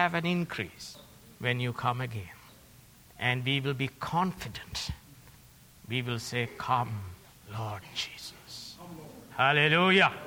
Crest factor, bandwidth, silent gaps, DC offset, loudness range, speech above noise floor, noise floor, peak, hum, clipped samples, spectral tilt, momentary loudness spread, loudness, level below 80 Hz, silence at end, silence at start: 22 dB; over 20 kHz; none; under 0.1%; 5 LU; 26 dB; -56 dBFS; -10 dBFS; none; under 0.1%; -5 dB/octave; 22 LU; -30 LUFS; -58 dBFS; 0 s; 0 s